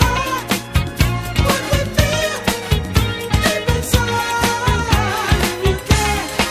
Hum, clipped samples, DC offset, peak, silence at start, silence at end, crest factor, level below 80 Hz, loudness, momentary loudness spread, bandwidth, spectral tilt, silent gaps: none; under 0.1%; under 0.1%; 0 dBFS; 0 s; 0 s; 18 dB; -24 dBFS; -17 LUFS; 3 LU; 16 kHz; -4.5 dB/octave; none